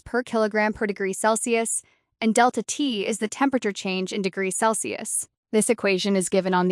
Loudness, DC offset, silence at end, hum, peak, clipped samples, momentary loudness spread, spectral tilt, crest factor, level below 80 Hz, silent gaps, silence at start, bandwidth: -23 LUFS; under 0.1%; 0 s; none; -6 dBFS; under 0.1%; 6 LU; -3.5 dB/octave; 18 dB; -60 dBFS; 5.37-5.43 s; 0.05 s; 12 kHz